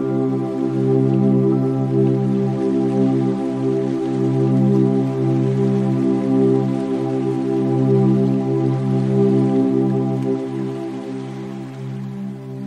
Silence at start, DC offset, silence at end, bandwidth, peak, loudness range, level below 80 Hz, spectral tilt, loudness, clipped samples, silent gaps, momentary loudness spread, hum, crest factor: 0 s; under 0.1%; 0 s; 9 kHz; -6 dBFS; 2 LU; -60 dBFS; -10 dB/octave; -18 LUFS; under 0.1%; none; 12 LU; none; 12 dB